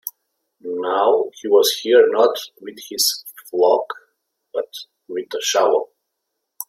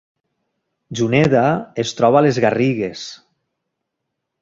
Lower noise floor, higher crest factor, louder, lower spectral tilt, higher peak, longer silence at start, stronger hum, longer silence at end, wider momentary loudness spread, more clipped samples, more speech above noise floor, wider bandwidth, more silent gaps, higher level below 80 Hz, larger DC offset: about the same, -77 dBFS vs -78 dBFS; about the same, 18 dB vs 18 dB; about the same, -18 LUFS vs -16 LUFS; second, -1 dB/octave vs -6 dB/octave; about the same, -2 dBFS vs -2 dBFS; second, 0.05 s vs 0.9 s; neither; second, 0.05 s vs 1.25 s; first, 19 LU vs 15 LU; neither; about the same, 60 dB vs 62 dB; first, 16.5 kHz vs 7.8 kHz; neither; second, -74 dBFS vs -54 dBFS; neither